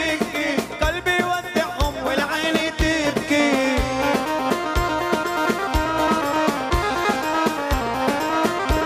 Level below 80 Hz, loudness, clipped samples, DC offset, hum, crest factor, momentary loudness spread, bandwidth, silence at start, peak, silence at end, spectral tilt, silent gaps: -32 dBFS; -21 LUFS; under 0.1%; under 0.1%; none; 16 dB; 3 LU; 15.5 kHz; 0 s; -4 dBFS; 0 s; -4.5 dB/octave; none